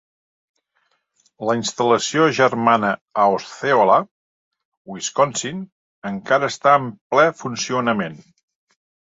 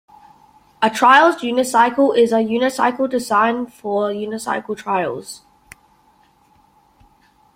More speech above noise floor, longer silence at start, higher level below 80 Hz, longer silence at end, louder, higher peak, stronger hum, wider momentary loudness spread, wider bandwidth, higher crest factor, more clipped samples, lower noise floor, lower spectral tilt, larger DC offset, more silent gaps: first, 49 dB vs 39 dB; first, 1.4 s vs 0.8 s; about the same, -64 dBFS vs -62 dBFS; second, 1 s vs 2.2 s; about the same, -19 LUFS vs -17 LUFS; about the same, -2 dBFS vs 0 dBFS; neither; about the same, 14 LU vs 13 LU; second, 8 kHz vs 16.5 kHz; about the same, 18 dB vs 18 dB; neither; first, -68 dBFS vs -55 dBFS; about the same, -4 dB/octave vs -4 dB/octave; neither; first, 3.01-3.06 s, 4.11-4.51 s, 4.65-4.85 s, 5.72-6.02 s, 7.01-7.10 s vs none